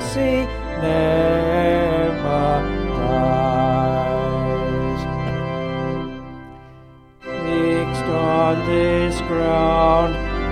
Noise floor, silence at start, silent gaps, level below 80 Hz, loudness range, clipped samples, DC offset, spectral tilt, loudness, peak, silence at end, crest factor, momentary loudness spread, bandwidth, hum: -45 dBFS; 0 s; none; -32 dBFS; 6 LU; under 0.1%; under 0.1%; -7 dB/octave; -19 LUFS; -4 dBFS; 0 s; 14 dB; 8 LU; 13.5 kHz; none